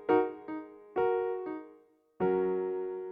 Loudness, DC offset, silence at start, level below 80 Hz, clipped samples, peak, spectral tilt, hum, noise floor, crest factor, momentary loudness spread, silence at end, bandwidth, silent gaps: -33 LUFS; under 0.1%; 0 s; -70 dBFS; under 0.1%; -14 dBFS; -10 dB/octave; none; -61 dBFS; 20 dB; 13 LU; 0 s; 4 kHz; none